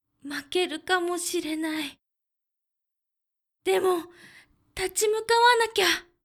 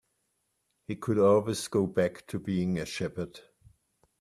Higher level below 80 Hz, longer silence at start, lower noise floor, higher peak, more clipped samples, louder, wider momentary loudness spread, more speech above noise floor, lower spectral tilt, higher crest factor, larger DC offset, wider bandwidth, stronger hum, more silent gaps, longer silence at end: about the same, -62 dBFS vs -64 dBFS; second, 0.25 s vs 0.9 s; first, -85 dBFS vs -78 dBFS; first, -8 dBFS vs -12 dBFS; neither; first, -25 LUFS vs -29 LUFS; about the same, 16 LU vs 16 LU; first, 60 dB vs 49 dB; second, -1 dB/octave vs -6 dB/octave; about the same, 20 dB vs 18 dB; neither; first, 19.5 kHz vs 14 kHz; neither; neither; second, 0.25 s vs 0.8 s